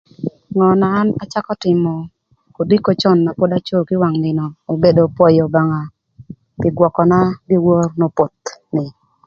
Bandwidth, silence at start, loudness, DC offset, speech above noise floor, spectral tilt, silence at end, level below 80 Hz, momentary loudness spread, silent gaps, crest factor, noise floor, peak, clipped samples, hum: 7.2 kHz; 0.2 s; -15 LUFS; under 0.1%; 24 dB; -8 dB/octave; 0.35 s; -50 dBFS; 12 LU; none; 16 dB; -38 dBFS; 0 dBFS; under 0.1%; none